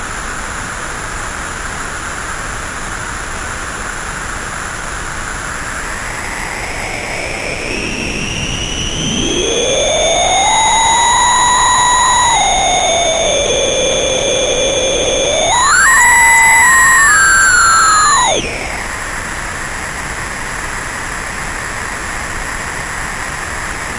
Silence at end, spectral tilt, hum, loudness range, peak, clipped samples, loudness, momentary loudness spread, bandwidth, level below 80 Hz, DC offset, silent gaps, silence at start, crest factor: 0 s; -1 dB/octave; none; 14 LU; 0 dBFS; under 0.1%; -12 LUFS; 15 LU; 12 kHz; -30 dBFS; under 0.1%; none; 0 s; 14 dB